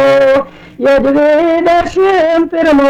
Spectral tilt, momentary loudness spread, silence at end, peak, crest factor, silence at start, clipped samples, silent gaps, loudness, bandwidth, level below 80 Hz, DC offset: -5.5 dB/octave; 4 LU; 0 s; -4 dBFS; 4 dB; 0 s; under 0.1%; none; -10 LUFS; 10 kHz; -38 dBFS; under 0.1%